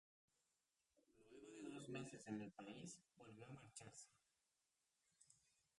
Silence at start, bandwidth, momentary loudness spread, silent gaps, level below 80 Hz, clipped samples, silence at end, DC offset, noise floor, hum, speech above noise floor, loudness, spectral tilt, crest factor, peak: 0.95 s; 11.5 kHz; 12 LU; none; -88 dBFS; under 0.1%; 0.4 s; under 0.1%; -90 dBFS; none; 33 dB; -57 LUFS; -4.5 dB/octave; 22 dB; -38 dBFS